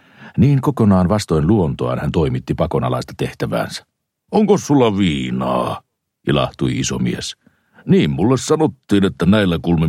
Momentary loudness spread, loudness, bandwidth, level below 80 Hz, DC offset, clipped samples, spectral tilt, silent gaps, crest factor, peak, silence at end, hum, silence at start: 10 LU; -17 LUFS; 14 kHz; -38 dBFS; under 0.1%; under 0.1%; -6.5 dB/octave; none; 14 dB; -2 dBFS; 0 s; none; 0.2 s